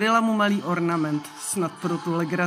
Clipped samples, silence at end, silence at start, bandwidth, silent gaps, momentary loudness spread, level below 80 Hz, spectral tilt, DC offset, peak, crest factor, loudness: under 0.1%; 0 s; 0 s; 16 kHz; none; 8 LU; -72 dBFS; -5 dB/octave; under 0.1%; -8 dBFS; 16 dB; -24 LUFS